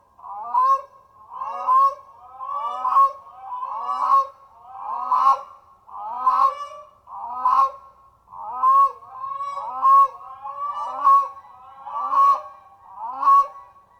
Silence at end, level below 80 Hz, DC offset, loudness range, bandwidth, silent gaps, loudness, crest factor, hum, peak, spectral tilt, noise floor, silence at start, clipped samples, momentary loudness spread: 0.35 s; -66 dBFS; under 0.1%; 3 LU; 8.4 kHz; none; -20 LUFS; 16 dB; none; -6 dBFS; -2.5 dB/octave; -51 dBFS; 0.25 s; under 0.1%; 20 LU